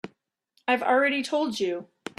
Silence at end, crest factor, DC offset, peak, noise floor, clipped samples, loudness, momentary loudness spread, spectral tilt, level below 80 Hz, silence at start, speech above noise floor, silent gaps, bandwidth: 0.35 s; 18 dB; under 0.1%; -8 dBFS; -71 dBFS; under 0.1%; -25 LUFS; 13 LU; -3.5 dB/octave; -74 dBFS; 0.05 s; 46 dB; none; 13 kHz